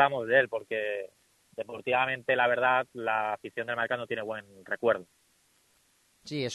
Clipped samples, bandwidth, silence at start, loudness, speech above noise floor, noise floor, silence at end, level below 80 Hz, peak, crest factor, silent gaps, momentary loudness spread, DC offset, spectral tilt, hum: under 0.1%; 12 kHz; 0 s; -29 LUFS; 38 dB; -68 dBFS; 0 s; -74 dBFS; -10 dBFS; 22 dB; none; 14 LU; under 0.1%; -4.5 dB/octave; none